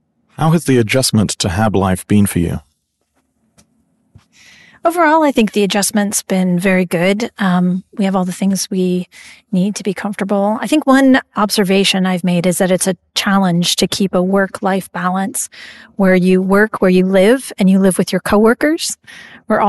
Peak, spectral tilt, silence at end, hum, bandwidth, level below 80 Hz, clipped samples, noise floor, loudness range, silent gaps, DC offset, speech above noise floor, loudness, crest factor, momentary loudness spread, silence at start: -2 dBFS; -5 dB/octave; 0 s; none; 12.5 kHz; -44 dBFS; under 0.1%; -65 dBFS; 5 LU; none; under 0.1%; 51 dB; -14 LUFS; 12 dB; 7 LU; 0.4 s